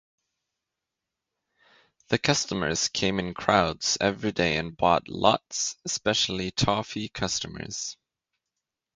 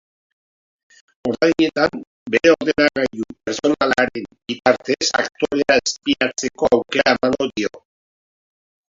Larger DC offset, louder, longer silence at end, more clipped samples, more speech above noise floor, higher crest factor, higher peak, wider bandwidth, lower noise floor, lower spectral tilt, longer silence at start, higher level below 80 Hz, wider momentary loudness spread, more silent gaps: neither; second, -26 LUFS vs -18 LUFS; second, 1 s vs 1.15 s; neither; second, 60 dB vs over 72 dB; first, 26 dB vs 20 dB; about the same, -2 dBFS vs 0 dBFS; first, 10.5 kHz vs 7.8 kHz; second, -86 dBFS vs under -90 dBFS; about the same, -3 dB/octave vs -3.5 dB/octave; first, 2.1 s vs 1.25 s; about the same, -52 dBFS vs -54 dBFS; about the same, 8 LU vs 10 LU; second, none vs 2.07-2.26 s